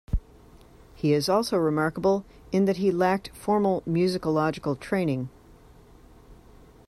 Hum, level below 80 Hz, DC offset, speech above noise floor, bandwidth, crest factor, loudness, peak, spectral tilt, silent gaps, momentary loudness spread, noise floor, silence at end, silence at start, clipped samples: none; -44 dBFS; under 0.1%; 27 dB; 14.5 kHz; 16 dB; -25 LUFS; -10 dBFS; -6.5 dB/octave; none; 7 LU; -52 dBFS; 0.55 s; 0.1 s; under 0.1%